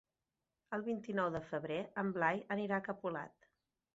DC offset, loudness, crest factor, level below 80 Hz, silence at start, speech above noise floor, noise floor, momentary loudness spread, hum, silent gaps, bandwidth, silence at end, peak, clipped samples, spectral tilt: under 0.1%; -39 LUFS; 22 dB; -76 dBFS; 0.7 s; over 51 dB; under -90 dBFS; 8 LU; none; none; 7.6 kHz; 0.65 s; -18 dBFS; under 0.1%; -5 dB/octave